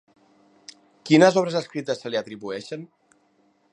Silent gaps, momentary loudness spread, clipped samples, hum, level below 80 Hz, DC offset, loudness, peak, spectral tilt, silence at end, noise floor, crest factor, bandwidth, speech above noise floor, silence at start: none; 21 LU; under 0.1%; none; -76 dBFS; under 0.1%; -22 LUFS; -2 dBFS; -5.5 dB/octave; 0.85 s; -64 dBFS; 22 dB; 10 kHz; 42 dB; 1.05 s